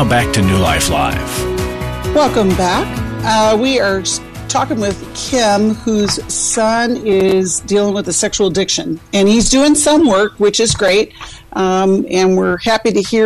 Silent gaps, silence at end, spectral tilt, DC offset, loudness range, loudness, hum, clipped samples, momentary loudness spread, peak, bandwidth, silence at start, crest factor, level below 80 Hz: none; 0 s; -4 dB/octave; under 0.1%; 3 LU; -13 LUFS; none; under 0.1%; 8 LU; -2 dBFS; 13.5 kHz; 0 s; 10 dB; -32 dBFS